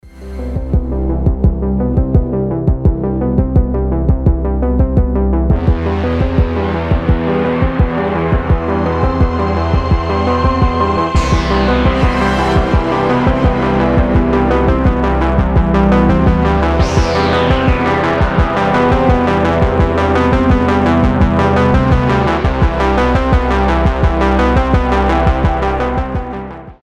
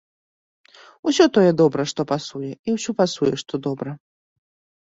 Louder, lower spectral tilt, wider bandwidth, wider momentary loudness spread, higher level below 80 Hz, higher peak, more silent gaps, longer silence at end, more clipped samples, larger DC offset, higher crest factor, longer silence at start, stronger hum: first, -13 LUFS vs -21 LUFS; first, -8 dB/octave vs -5.5 dB/octave; about the same, 8.4 kHz vs 8 kHz; second, 4 LU vs 15 LU; first, -18 dBFS vs -62 dBFS; about the same, 0 dBFS vs -2 dBFS; second, none vs 2.59-2.64 s; second, 0.1 s vs 1 s; neither; neither; second, 12 dB vs 20 dB; second, 0.05 s vs 1.05 s; neither